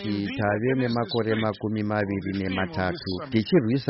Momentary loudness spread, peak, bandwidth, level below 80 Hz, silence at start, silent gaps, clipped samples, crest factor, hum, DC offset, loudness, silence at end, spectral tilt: 6 LU; -10 dBFS; 6 kHz; -56 dBFS; 0 s; none; under 0.1%; 16 dB; none; under 0.1%; -26 LUFS; 0 s; -5.5 dB/octave